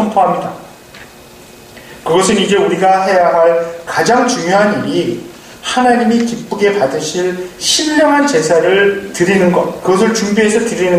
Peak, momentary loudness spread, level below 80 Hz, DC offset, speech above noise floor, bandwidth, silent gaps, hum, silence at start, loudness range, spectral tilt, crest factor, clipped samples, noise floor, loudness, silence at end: 0 dBFS; 8 LU; -50 dBFS; under 0.1%; 25 dB; 15.5 kHz; none; none; 0 s; 3 LU; -4 dB/octave; 12 dB; under 0.1%; -37 dBFS; -12 LUFS; 0 s